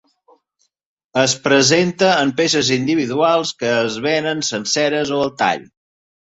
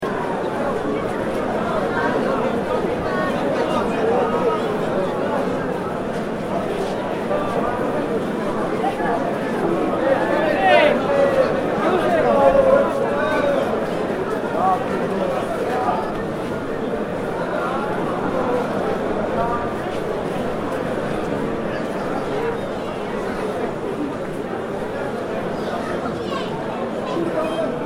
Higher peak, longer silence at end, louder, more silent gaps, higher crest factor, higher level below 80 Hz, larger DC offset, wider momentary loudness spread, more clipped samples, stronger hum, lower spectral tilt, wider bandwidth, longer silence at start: about the same, -2 dBFS vs -2 dBFS; first, 0.65 s vs 0 s; first, -17 LUFS vs -21 LUFS; neither; about the same, 16 dB vs 20 dB; second, -58 dBFS vs -44 dBFS; neither; about the same, 6 LU vs 8 LU; neither; neither; second, -3.5 dB/octave vs -6.5 dB/octave; second, 8.2 kHz vs 16 kHz; first, 1.15 s vs 0 s